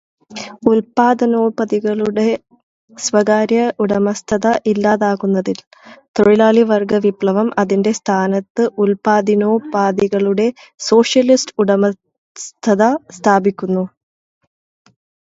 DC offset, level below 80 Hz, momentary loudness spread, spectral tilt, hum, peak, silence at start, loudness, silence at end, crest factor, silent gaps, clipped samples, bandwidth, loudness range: under 0.1%; -56 dBFS; 9 LU; -5.5 dB/octave; none; 0 dBFS; 0.3 s; -15 LUFS; 1.45 s; 16 dB; 2.63-2.88 s, 5.67-5.71 s, 6.08-6.14 s, 8.50-8.55 s, 12.18-12.35 s; under 0.1%; 8 kHz; 2 LU